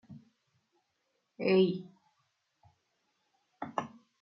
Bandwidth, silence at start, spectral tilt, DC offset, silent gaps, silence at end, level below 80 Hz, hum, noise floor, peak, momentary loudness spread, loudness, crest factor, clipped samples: 6.2 kHz; 0.1 s; -5.5 dB/octave; under 0.1%; none; 0.35 s; -84 dBFS; none; -80 dBFS; -14 dBFS; 19 LU; -32 LUFS; 22 dB; under 0.1%